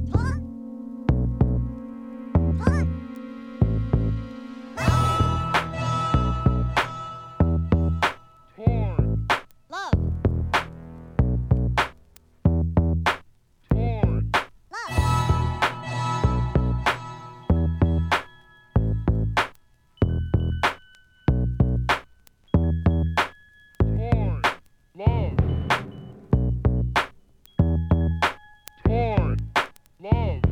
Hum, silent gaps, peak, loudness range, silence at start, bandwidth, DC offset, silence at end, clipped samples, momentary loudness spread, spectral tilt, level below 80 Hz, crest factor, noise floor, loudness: none; none; -6 dBFS; 2 LU; 0 s; 13.5 kHz; under 0.1%; 0 s; under 0.1%; 13 LU; -7 dB/octave; -30 dBFS; 18 dB; -55 dBFS; -24 LUFS